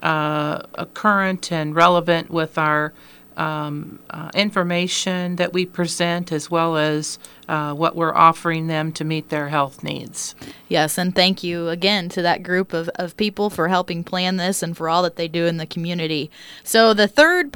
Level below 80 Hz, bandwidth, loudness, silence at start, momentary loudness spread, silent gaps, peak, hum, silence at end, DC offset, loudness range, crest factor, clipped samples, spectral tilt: -60 dBFS; 19 kHz; -20 LUFS; 0 s; 13 LU; none; 0 dBFS; none; 0.05 s; under 0.1%; 2 LU; 20 dB; under 0.1%; -4.5 dB/octave